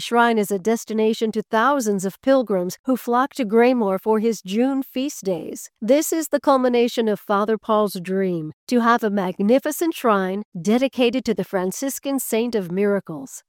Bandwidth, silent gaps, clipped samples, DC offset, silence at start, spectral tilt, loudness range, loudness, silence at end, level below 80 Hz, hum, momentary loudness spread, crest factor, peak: 17.5 kHz; 2.79-2.84 s, 8.53-8.67 s, 10.45-10.52 s; under 0.1%; under 0.1%; 0 s; -5 dB/octave; 1 LU; -21 LUFS; 0.1 s; -66 dBFS; none; 7 LU; 16 dB; -4 dBFS